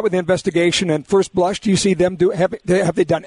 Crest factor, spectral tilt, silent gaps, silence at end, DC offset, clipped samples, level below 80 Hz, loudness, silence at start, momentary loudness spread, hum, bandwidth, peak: 12 dB; -5 dB/octave; none; 0 s; under 0.1%; under 0.1%; -46 dBFS; -17 LUFS; 0 s; 2 LU; none; 11 kHz; -6 dBFS